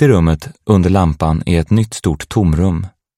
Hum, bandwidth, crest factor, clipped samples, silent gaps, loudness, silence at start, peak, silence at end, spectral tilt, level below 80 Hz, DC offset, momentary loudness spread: none; 14 kHz; 14 dB; under 0.1%; none; -15 LUFS; 0 s; 0 dBFS; 0.3 s; -7.5 dB/octave; -26 dBFS; under 0.1%; 7 LU